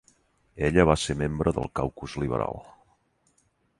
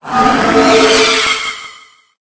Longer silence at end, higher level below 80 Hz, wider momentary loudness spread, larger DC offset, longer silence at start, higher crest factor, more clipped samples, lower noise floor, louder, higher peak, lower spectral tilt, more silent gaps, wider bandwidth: first, 1.1 s vs 0.5 s; about the same, -42 dBFS vs -40 dBFS; about the same, 11 LU vs 11 LU; neither; first, 0.55 s vs 0.05 s; first, 24 dB vs 12 dB; neither; first, -69 dBFS vs -40 dBFS; second, -26 LUFS vs -9 LUFS; second, -4 dBFS vs 0 dBFS; first, -6 dB/octave vs -2.5 dB/octave; neither; first, 11.5 kHz vs 8 kHz